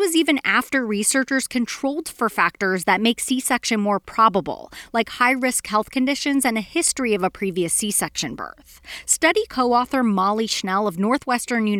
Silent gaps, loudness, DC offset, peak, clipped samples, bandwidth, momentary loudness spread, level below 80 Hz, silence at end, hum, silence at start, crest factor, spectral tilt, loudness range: none; -20 LUFS; under 0.1%; -4 dBFS; under 0.1%; 19.5 kHz; 8 LU; -54 dBFS; 0 s; none; 0 s; 16 dB; -3 dB/octave; 1 LU